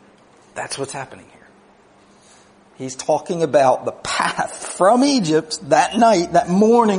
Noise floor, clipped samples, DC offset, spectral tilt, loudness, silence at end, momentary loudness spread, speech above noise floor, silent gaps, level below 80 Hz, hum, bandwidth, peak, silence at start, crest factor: -51 dBFS; under 0.1%; under 0.1%; -4.5 dB/octave; -17 LUFS; 0 s; 17 LU; 34 dB; none; -58 dBFS; none; 11 kHz; -2 dBFS; 0.55 s; 18 dB